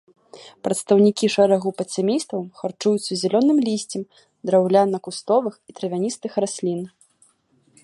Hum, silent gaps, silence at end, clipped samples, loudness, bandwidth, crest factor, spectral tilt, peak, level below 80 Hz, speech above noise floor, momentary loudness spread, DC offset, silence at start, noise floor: none; none; 0.95 s; under 0.1%; -21 LUFS; 11.5 kHz; 18 dB; -5.5 dB/octave; -4 dBFS; -70 dBFS; 41 dB; 14 LU; under 0.1%; 0.35 s; -61 dBFS